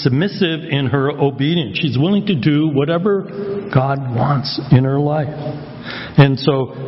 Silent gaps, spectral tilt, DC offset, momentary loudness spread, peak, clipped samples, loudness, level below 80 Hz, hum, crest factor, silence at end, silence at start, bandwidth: none; -10 dB/octave; under 0.1%; 11 LU; 0 dBFS; under 0.1%; -17 LUFS; -48 dBFS; none; 16 dB; 0 s; 0 s; 5.8 kHz